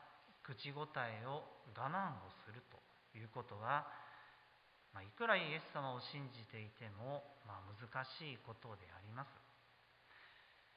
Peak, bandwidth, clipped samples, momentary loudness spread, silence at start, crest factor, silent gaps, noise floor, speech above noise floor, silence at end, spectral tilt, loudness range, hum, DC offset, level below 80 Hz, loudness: -20 dBFS; 5 kHz; under 0.1%; 21 LU; 0 s; 28 dB; none; -71 dBFS; 23 dB; 0 s; -3 dB/octave; 8 LU; none; under 0.1%; -80 dBFS; -47 LUFS